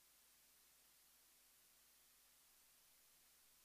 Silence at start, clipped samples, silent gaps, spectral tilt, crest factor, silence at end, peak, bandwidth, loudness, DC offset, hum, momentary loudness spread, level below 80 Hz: 0 s; under 0.1%; none; 0.5 dB/octave; 14 dB; 0 s; -60 dBFS; 15.5 kHz; -70 LUFS; under 0.1%; none; 0 LU; under -90 dBFS